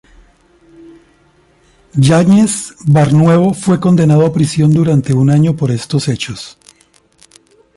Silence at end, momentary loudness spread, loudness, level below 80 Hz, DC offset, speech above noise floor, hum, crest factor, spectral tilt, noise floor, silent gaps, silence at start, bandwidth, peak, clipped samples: 1.25 s; 10 LU; -11 LUFS; -46 dBFS; under 0.1%; 41 dB; none; 12 dB; -7 dB/octave; -51 dBFS; none; 1.95 s; 11.5 kHz; 0 dBFS; under 0.1%